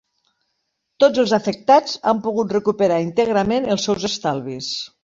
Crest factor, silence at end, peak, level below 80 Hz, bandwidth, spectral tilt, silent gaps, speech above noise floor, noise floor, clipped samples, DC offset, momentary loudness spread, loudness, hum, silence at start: 18 dB; 0.15 s; -2 dBFS; -54 dBFS; 7.8 kHz; -4.5 dB/octave; none; 55 dB; -74 dBFS; under 0.1%; under 0.1%; 9 LU; -19 LUFS; none; 1 s